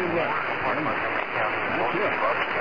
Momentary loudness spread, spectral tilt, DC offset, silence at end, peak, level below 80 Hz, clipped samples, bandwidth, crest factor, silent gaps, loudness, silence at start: 2 LU; -6.5 dB/octave; 0.6%; 0 s; -12 dBFS; -60 dBFS; under 0.1%; 5.2 kHz; 14 dB; none; -25 LUFS; 0 s